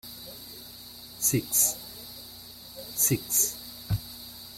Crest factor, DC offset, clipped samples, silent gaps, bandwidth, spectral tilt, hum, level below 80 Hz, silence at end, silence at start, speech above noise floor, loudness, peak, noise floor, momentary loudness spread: 22 dB; under 0.1%; under 0.1%; none; 16.5 kHz; -3 dB/octave; 60 Hz at -55 dBFS; -52 dBFS; 0 s; 0.05 s; 20 dB; -25 LUFS; -10 dBFS; -46 dBFS; 20 LU